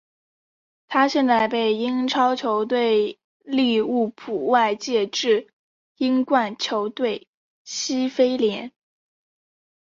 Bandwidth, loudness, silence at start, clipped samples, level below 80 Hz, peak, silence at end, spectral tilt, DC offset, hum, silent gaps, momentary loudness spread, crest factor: 7.6 kHz; -22 LUFS; 0.9 s; under 0.1%; -70 dBFS; -6 dBFS; 1.1 s; -3.5 dB/octave; under 0.1%; none; 3.24-3.40 s, 5.53-5.95 s, 7.27-7.65 s; 7 LU; 18 dB